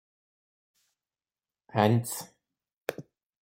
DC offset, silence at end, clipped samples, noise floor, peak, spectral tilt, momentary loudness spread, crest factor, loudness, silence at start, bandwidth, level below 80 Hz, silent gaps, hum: under 0.1%; 0.4 s; under 0.1%; under -90 dBFS; -8 dBFS; -6 dB/octave; 20 LU; 26 dB; -30 LUFS; 1.75 s; 16.5 kHz; -70 dBFS; 2.77-2.82 s; none